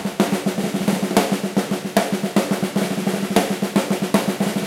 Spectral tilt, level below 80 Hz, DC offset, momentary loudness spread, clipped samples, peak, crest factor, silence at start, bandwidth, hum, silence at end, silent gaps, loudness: -5 dB/octave; -58 dBFS; under 0.1%; 3 LU; under 0.1%; 0 dBFS; 20 dB; 0 s; 17 kHz; none; 0 s; none; -21 LUFS